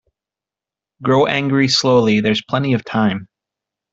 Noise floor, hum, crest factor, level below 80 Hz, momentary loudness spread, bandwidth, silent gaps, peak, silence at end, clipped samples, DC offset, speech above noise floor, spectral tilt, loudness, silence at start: -88 dBFS; none; 18 dB; -54 dBFS; 6 LU; 8 kHz; none; 0 dBFS; 0.7 s; under 0.1%; under 0.1%; 72 dB; -5.5 dB/octave; -16 LUFS; 1 s